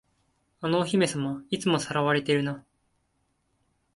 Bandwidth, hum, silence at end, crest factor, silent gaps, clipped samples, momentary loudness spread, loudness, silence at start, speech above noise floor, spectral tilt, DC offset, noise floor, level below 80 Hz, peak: 11.5 kHz; none; 1.35 s; 18 dB; none; under 0.1%; 9 LU; -27 LUFS; 0.6 s; 47 dB; -5 dB/octave; under 0.1%; -73 dBFS; -66 dBFS; -12 dBFS